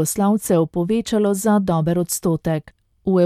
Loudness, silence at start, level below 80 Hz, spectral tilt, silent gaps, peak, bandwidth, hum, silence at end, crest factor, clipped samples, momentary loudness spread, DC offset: -20 LUFS; 0 s; -48 dBFS; -6 dB/octave; none; -6 dBFS; 15.5 kHz; none; 0 s; 14 dB; under 0.1%; 6 LU; under 0.1%